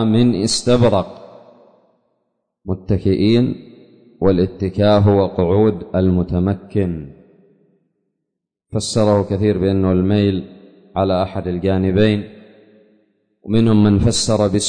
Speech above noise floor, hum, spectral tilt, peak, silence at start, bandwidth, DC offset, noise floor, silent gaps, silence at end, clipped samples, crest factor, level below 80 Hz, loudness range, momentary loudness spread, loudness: 63 dB; none; -6.5 dB/octave; -4 dBFS; 0 s; 9.6 kHz; under 0.1%; -78 dBFS; none; 0 s; under 0.1%; 14 dB; -40 dBFS; 5 LU; 12 LU; -17 LUFS